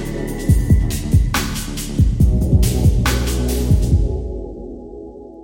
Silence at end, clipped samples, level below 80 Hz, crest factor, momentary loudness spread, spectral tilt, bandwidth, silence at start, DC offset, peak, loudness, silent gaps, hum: 0 s; under 0.1%; -20 dBFS; 16 dB; 17 LU; -6 dB/octave; 17 kHz; 0 s; under 0.1%; -2 dBFS; -18 LUFS; none; none